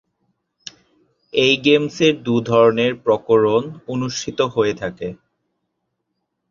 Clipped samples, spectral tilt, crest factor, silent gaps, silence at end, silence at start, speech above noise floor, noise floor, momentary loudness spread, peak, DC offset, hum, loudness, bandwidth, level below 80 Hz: under 0.1%; -5 dB/octave; 18 dB; none; 1.35 s; 1.35 s; 58 dB; -75 dBFS; 17 LU; -2 dBFS; under 0.1%; none; -18 LUFS; 7.4 kHz; -56 dBFS